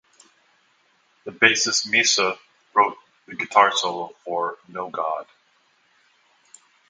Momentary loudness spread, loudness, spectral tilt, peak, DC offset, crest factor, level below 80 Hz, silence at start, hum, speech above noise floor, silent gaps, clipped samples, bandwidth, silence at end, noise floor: 17 LU; -21 LUFS; -0.5 dB/octave; 0 dBFS; under 0.1%; 24 dB; -74 dBFS; 1.25 s; none; 41 dB; none; under 0.1%; 10.5 kHz; 1.65 s; -63 dBFS